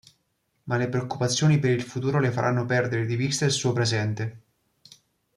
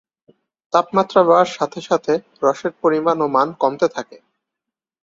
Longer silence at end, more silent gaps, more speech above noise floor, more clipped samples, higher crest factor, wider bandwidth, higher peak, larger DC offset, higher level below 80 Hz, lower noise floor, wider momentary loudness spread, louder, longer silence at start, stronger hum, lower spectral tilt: first, 1 s vs 0.85 s; neither; second, 49 dB vs 67 dB; neither; about the same, 16 dB vs 18 dB; first, 12.5 kHz vs 7.8 kHz; second, -8 dBFS vs 0 dBFS; neither; about the same, -62 dBFS vs -66 dBFS; second, -73 dBFS vs -84 dBFS; about the same, 8 LU vs 8 LU; second, -25 LUFS vs -18 LUFS; about the same, 0.65 s vs 0.75 s; neither; about the same, -5 dB/octave vs -5.5 dB/octave